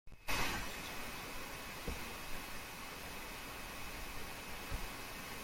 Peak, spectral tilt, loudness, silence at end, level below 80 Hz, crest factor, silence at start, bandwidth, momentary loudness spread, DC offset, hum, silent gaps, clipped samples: -24 dBFS; -2.5 dB/octave; -44 LUFS; 0 s; -52 dBFS; 20 dB; 0.05 s; 16.5 kHz; 7 LU; under 0.1%; none; none; under 0.1%